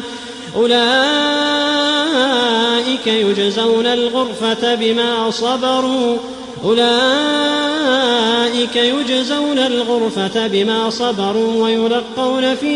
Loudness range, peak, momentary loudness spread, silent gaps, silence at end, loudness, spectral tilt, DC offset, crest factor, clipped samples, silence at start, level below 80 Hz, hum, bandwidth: 2 LU; -4 dBFS; 5 LU; none; 0 s; -15 LUFS; -3.5 dB/octave; under 0.1%; 12 dB; under 0.1%; 0 s; -56 dBFS; none; 11 kHz